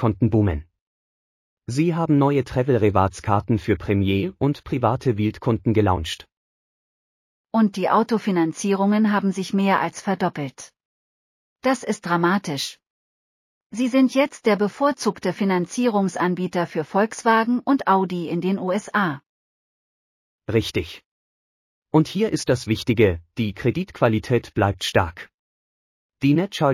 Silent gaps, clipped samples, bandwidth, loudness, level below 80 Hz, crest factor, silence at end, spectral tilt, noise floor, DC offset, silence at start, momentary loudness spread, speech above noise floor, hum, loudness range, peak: 0.81-1.57 s, 6.37-7.44 s, 10.85-11.56 s, 12.90-13.70 s, 19.26-20.39 s, 21.06-21.82 s, 25.34-26.09 s; under 0.1%; 15 kHz; -21 LUFS; -48 dBFS; 18 dB; 0 s; -6.5 dB/octave; under -90 dBFS; under 0.1%; 0 s; 7 LU; over 69 dB; none; 4 LU; -4 dBFS